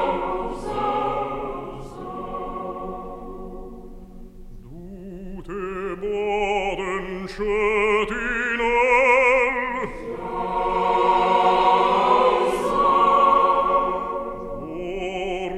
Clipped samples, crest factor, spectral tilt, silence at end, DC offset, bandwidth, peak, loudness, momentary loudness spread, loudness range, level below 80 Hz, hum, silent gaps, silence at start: under 0.1%; 16 dB; -5 dB/octave; 0 s; under 0.1%; 13 kHz; -6 dBFS; -21 LUFS; 19 LU; 17 LU; -40 dBFS; none; none; 0 s